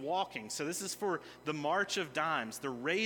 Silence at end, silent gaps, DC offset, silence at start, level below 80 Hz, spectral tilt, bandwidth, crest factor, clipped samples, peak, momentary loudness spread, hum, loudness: 0 s; none; under 0.1%; 0 s; -76 dBFS; -3 dB/octave; 18 kHz; 18 dB; under 0.1%; -18 dBFS; 6 LU; none; -36 LUFS